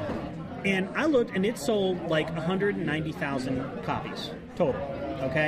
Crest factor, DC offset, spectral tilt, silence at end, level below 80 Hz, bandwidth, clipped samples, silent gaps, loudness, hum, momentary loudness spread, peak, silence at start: 16 dB; under 0.1%; -6 dB/octave; 0 s; -52 dBFS; 15.5 kHz; under 0.1%; none; -29 LUFS; none; 9 LU; -12 dBFS; 0 s